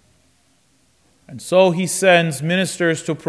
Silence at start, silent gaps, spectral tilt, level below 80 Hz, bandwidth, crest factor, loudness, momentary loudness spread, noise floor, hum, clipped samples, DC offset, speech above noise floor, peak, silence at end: 1.3 s; none; -4.5 dB/octave; -66 dBFS; 11 kHz; 18 dB; -17 LUFS; 6 LU; -60 dBFS; none; under 0.1%; under 0.1%; 43 dB; -2 dBFS; 0 s